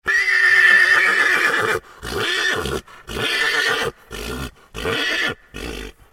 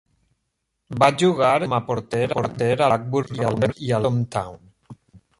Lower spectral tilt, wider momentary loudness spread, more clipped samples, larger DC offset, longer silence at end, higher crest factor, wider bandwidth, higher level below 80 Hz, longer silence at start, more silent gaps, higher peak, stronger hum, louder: second, -2 dB/octave vs -6.5 dB/octave; first, 20 LU vs 9 LU; neither; neither; second, 0.25 s vs 0.45 s; about the same, 18 dB vs 20 dB; first, 17 kHz vs 11.5 kHz; first, -42 dBFS vs -54 dBFS; second, 0.05 s vs 0.9 s; neither; about the same, -2 dBFS vs -4 dBFS; neither; first, -16 LUFS vs -21 LUFS